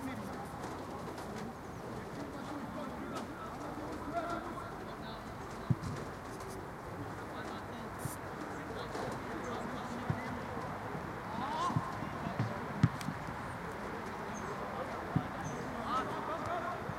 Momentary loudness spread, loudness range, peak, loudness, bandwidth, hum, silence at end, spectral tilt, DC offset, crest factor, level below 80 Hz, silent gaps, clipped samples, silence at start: 8 LU; 5 LU; -14 dBFS; -40 LUFS; 16.5 kHz; none; 0 s; -6 dB/octave; under 0.1%; 26 dB; -58 dBFS; none; under 0.1%; 0 s